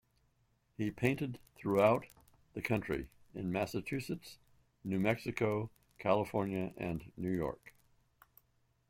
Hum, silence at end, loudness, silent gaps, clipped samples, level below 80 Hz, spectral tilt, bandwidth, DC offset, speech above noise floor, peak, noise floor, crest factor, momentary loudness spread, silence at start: none; 1.2 s; -36 LUFS; none; under 0.1%; -62 dBFS; -7 dB/octave; 16.5 kHz; under 0.1%; 40 dB; -16 dBFS; -75 dBFS; 22 dB; 14 LU; 0.8 s